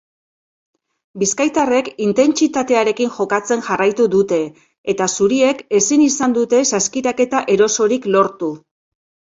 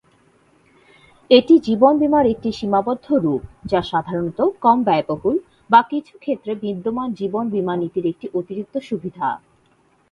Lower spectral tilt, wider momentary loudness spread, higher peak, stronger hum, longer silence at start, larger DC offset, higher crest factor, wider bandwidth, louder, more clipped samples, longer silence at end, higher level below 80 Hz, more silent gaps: second, -3.5 dB/octave vs -7.5 dB/octave; second, 6 LU vs 12 LU; about the same, 0 dBFS vs 0 dBFS; neither; second, 1.15 s vs 1.3 s; neither; about the same, 16 dB vs 18 dB; first, 8 kHz vs 7.2 kHz; first, -16 LUFS vs -19 LUFS; neither; about the same, 0.75 s vs 0.75 s; second, -58 dBFS vs -52 dBFS; first, 4.78-4.84 s vs none